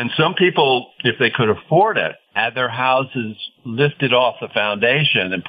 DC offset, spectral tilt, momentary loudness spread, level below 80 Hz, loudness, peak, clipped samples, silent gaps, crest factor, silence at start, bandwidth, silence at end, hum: under 0.1%; -8.5 dB/octave; 7 LU; -62 dBFS; -17 LUFS; -2 dBFS; under 0.1%; none; 16 dB; 0 s; 5 kHz; 0 s; none